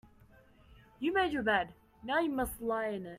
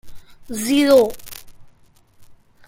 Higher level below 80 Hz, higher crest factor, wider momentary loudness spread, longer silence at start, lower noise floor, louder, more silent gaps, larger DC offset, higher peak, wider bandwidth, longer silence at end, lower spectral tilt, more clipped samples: second, -58 dBFS vs -48 dBFS; about the same, 18 dB vs 18 dB; second, 7 LU vs 24 LU; first, 0.7 s vs 0.05 s; first, -61 dBFS vs -52 dBFS; second, -33 LUFS vs -16 LUFS; neither; neither; second, -18 dBFS vs -2 dBFS; about the same, 16 kHz vs 16.5 kHz; second, 0 s vs 0.35 s; about the same, -4.5 dB/octave vs -3.5 dB/octave; neither